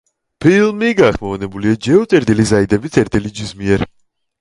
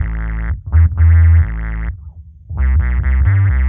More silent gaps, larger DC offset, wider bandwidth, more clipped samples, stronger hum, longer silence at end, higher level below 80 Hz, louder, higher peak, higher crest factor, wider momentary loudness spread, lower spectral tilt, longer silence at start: neither; neither; first, 11.5 kHz vs 2.8 kHz; neither; neither; first, 0.55 s vs 0 s; second, -38 dBFS vs -16 dBFS; about the same, -14 LUFS vs -15 LUFS; about the same, 0 dBFS vs -2 dBFS; about the same, 14 dB vs 10 dB; second, 10 LU vs 15 LU; second, -6 dB/octave vs -9.5 dB/octave; first, 0.4 s vs 0 s